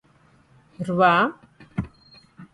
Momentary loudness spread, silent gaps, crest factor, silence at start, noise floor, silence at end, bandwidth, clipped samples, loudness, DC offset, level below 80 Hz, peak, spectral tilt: 16 LU; none; 20 dB; 0.8 s; -58 dBFS; 0.1 s; 11.5 kHz; under 0.1%; -22 LUFS; under 0.1%; -52 dBFS; -6 dBFS; -7 dB/octave